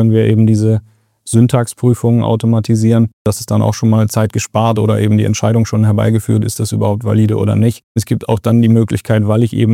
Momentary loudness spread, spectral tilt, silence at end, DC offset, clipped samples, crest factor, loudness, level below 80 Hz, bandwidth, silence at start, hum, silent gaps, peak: 5 LU; -7 dB/octave; 0 s; under 0.1%; under 0.1%; 12 dB; -13 LUFS; -46 dBFS; 15 kHz; 0 s; none; 3.13-3.25 s, 7.83-7.95 s; 0 dBFS